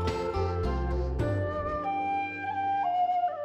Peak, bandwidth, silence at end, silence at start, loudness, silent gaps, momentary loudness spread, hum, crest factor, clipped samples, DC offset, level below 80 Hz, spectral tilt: -18 dBFS; 9 kHz; 0 s; 0 s; -30 LUFS; none; 4 LU; none; 12 dB; under 0.1%; under 0.1%; -38 dBFS; -7.5 dB/octave